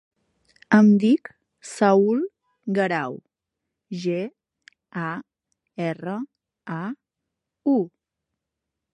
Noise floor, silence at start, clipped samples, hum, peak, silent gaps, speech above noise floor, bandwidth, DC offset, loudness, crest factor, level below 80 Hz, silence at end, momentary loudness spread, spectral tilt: -84 dBFS; 0.7 s; under 0.1%; none; -4 dBFS; none; 63 dB; 11 kHz; under 0.1%; -23 LUFS; 20 dB; -74 dBFS; 1.05 s; 21 LU; -7 dB/octave